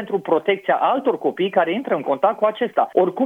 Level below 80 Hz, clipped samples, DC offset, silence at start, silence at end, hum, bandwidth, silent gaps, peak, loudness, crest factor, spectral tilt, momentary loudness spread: -74 dBFS; under 0.1%; under 0.1%; 0 s; 0 s; none; 4.2 kHz; none; -2 dBFS; -20 LUFS; 16 dB; -7 dB/octave; 3 LU